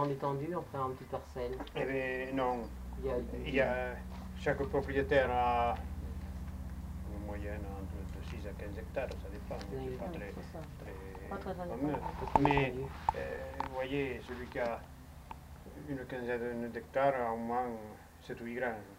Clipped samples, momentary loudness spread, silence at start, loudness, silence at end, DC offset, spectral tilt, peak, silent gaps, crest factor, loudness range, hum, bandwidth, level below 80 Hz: under 0.1%; 15 LU; 0 s; -37 LUFS; 0 s; under 0.1%; -7 dB/octave; -10 dBFS; none; 28 dB; 9 LU; none; 16 kHz; -48 dBFS